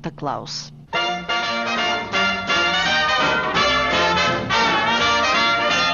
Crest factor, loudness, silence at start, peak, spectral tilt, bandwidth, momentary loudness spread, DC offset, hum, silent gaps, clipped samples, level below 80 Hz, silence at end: 14 dB; -18 LUFS; 0 s; -6 dBFS; -3 dB/octave; 7.4 kHz; 9 LU; under 0.1%; none; none; under 0.1%; -46 dBFS; 0 s